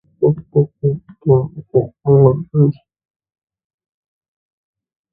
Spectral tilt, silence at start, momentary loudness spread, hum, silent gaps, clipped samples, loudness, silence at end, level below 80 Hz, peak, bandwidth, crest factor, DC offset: -15.5 dB/octave; 0.2 s; 9 LU; none; none; under 0.1%; -16 LUFS; 2.4 s; -52 dBFS; 0 dBFS; 1.5 kHz; 18 dB; under 0.1%